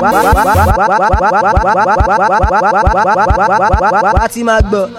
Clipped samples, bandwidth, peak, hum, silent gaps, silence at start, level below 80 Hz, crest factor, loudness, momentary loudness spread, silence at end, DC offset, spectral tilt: 0.2%; 17 kHz; 0 dBFS; none; none; 0 s; -18 dBFS; 10 dB; -10 LUFS; 2 LU; 0 s; under 0.1%; -6 dB/octave